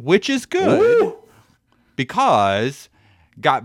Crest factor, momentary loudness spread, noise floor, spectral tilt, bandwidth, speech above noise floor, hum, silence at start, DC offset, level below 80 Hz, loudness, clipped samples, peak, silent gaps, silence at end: 18 dB; 11 LU; -59 dBFS; -5 dB/octave; 13.5 kHz; 42 dB; none; 0 s; under 0.1%; -60 dBFS; -18 LUFS; under 0.1%; -2 dBFS; none; 0 s